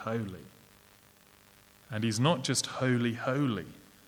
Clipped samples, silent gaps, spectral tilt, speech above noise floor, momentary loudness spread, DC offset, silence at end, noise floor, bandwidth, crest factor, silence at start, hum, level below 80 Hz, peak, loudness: under 0.1%; none; -4.5 dB/octave; 30 dB; 14 LU; under 0.1%; 0.3 s; -60 dBFS; over 20 kHz; 20 dB; 0 s; 50 Hz at -65 dBFS; -68 dBFS; -12 dBFS; -31 LUFS